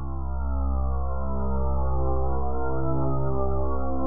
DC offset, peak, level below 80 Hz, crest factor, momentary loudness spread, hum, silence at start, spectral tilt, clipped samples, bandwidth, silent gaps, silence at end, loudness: 6%; -12 dBFS; -28 dBFS; 12 dB; 3 LU; none; 0 s; -13.5 dB/octave; under 0.1%; 1.5 kHz; none; 0 s; -28 LUFS